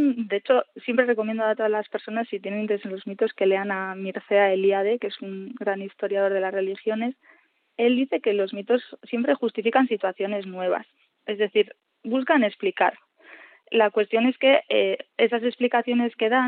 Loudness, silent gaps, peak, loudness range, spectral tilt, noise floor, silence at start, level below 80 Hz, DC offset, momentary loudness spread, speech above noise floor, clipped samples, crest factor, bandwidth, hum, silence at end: -24 LUFS; none; -6 dBFS; 3 LU; -8.5 dB/octave; -49 dBFS; 0 s; under -90 dBFS; under 0.1%; 9 LU; 26 dB; under 0.1%; 18 dB; 4.6 kHz; none; 0 s